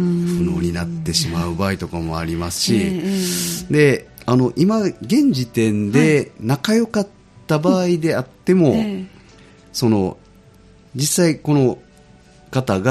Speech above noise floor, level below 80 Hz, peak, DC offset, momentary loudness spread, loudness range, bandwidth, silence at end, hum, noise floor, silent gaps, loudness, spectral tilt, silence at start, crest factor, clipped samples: 30 dB; -44 dBFS; -2 dBFS; under 0.1%; 9 LU; 3 LU; 15.5 kHz; 0 s; none; -47 dBFS; none; -18 LUFS; -5.5 dB/octave; 0 s; 16 dB; under 0.1%